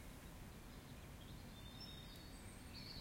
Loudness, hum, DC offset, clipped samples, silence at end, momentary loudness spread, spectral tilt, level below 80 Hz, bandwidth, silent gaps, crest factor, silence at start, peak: -56 LUFS; none; under 0.1%; under 0.1%; 0 s; 3 LU; -4 dB/octave; -60 dBFS; 16.5 kHz; none; 14 dB; 0 s; -42 dBFS